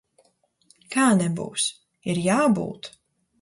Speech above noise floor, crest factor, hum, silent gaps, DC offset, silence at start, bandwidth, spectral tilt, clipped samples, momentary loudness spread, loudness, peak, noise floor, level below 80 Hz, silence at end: 43 dB; 16 dB; none; none; under 0.1%; 0.9 s; 11.5 kHz; -4.5 dB/octave; under 0.1%; 15 LU; -23 LUFS; -8 dBFS; -65 dBFS; -64 dBFS; 0.55 s